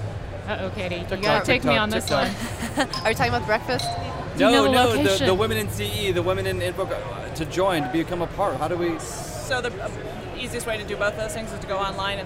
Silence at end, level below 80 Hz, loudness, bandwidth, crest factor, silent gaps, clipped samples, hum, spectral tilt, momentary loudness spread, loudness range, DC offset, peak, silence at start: 0 s; -42 dBFS; -24 LUFS; 16 kHz; 18 dB; none; under 0.1%; none; -4.5 dB/octave; 11 LU; 6 LU; under 0.1%; -6 dBFS; 0 s